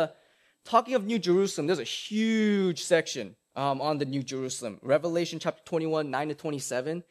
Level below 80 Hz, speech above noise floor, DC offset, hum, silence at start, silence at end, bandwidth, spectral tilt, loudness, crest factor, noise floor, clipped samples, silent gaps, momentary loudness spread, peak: -80 dBFS; 36 dB; under 0.1%; none; 0 s; 0.1 s; 14 kHz; -5 dB/octave; -28 LUFS; 20 dB; -64 dBFS; under 0.1%; none; 8 LU; -8 dBFS